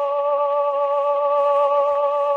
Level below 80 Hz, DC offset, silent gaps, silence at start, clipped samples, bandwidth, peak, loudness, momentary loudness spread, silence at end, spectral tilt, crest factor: -76 dBFS; under 0.1%; none; 0 s; under 0.1%; 4.5 kHz; -8 dBFS; -19 LUFS; 3 LU; 0 s; -2.5 dB/octave; 10 dB